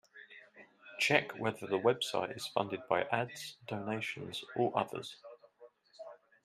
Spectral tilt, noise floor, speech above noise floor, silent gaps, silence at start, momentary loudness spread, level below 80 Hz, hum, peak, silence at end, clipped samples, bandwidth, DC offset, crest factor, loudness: -4 dB/octave; -61 dBFS; 26 dB; none; 0.15 s; 23 LU; -78 dBFS; none; -10 dBFS; 0.3 s; under 0.1%; 15.5 kHz; under 0.1%; 26 dB; -35 LUFS